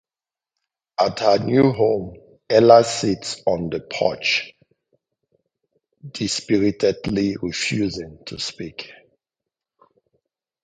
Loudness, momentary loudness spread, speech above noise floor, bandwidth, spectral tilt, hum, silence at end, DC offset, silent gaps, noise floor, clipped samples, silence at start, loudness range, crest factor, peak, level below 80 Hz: -20 LUFS; 18 LU; over 71 dB; 9.4 kHz; -5 dB/octave; none; 1.7 s; under 0.1%; none; under -90 dBFS; under 0.1%; 1 s; 8 LU; 22 dB; 0 dBFS; -52 dBFS